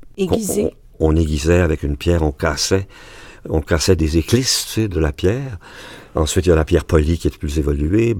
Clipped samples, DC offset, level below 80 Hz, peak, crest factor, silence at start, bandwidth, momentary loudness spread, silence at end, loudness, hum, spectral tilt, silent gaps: under 0.1%; under 0.1%; -26 dBFS; 0 dBFS; 18 dB; 0 s; 17.5 kHz; 9 LU; 0 s; -18 LUFS; none; -5.5 dB/octave; none